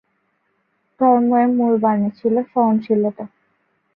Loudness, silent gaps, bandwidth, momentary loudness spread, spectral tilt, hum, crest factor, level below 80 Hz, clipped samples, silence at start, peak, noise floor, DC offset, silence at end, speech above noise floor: -17 LUFS; none; 4.5 kHz; 7 LU; -12 dB/octave; none; 16 dB; -68 dBFS; under 0.1%; 1 s; -4 dBFS; -67 dBFS; under 0.1%; 0.7 s; 51 dB